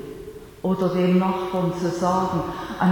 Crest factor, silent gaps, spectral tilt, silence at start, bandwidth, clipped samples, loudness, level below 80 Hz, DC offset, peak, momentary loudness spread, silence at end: 14 dB; none; -7.5 dB/octave; 0 s; 18.5 kHz; under 0.1%; -23 LUFS; -50 dBFS; under 0.1%; -8 dBFS; 14 LU; 0 s